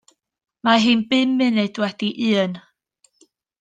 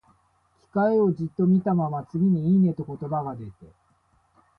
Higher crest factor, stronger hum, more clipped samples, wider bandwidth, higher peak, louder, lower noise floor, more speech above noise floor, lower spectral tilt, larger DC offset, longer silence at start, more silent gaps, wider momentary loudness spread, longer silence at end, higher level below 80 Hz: about the same, 18 dB vs 14 dB; neither; neither; first, 9.2 kHz vs 4 kHz; first, -2 dBFS vs -12 dBFS; first, -19 LUFS vs -24 LUFS; about the same, -63 dBFS vs -65 dBFS; about the same, 44 dB vs 42 dB; second, -5 dB/octave vs -12 dB/octave; neither; about the same, 0.65 s vs 0.75 s; neither; second, 8 LU vs 12 LU; about the same, 1 s vs 0.95 s; second, -68 dBFS vs -60 dBFS